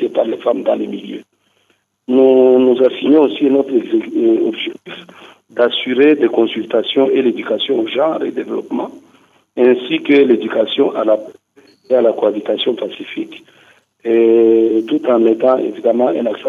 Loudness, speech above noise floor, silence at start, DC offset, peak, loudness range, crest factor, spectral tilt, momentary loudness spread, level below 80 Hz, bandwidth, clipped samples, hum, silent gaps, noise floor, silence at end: -14 LUFS; 47 dB; 0 s; under 0.1%; -2 dBFS; 4 LU; 14 dB; -6.5 dB/octave; 14 LU; -72 dBFS; 6.8 kHz; under 0.1%; none; none; -61 dBFS; 0 s